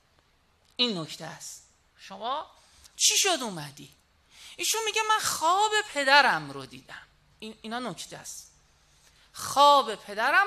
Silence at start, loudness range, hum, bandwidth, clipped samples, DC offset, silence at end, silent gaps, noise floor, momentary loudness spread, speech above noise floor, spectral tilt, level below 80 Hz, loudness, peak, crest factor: 0.8 s; 4 LU; none; 13.5 kHz; under 0.1%; under 0.1%; 0 s; none; -65 dBFS; 25 LU; 39 dB; -1 dB/octave; -68 dBFS; -24 LUFS; -4 dBFS; 24 dB